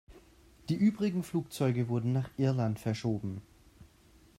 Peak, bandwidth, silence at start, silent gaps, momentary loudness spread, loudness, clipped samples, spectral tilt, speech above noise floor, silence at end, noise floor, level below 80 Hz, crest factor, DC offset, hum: -16 dBFS; 15 kHz; 0.1 s; none; 8 LU; -32 LUFS; under 0.1%; -7.5 dB/octave; 30 dB; 0.55 s; -61 dBFS; -62 dBFS; 16 dB; under 0.1%; none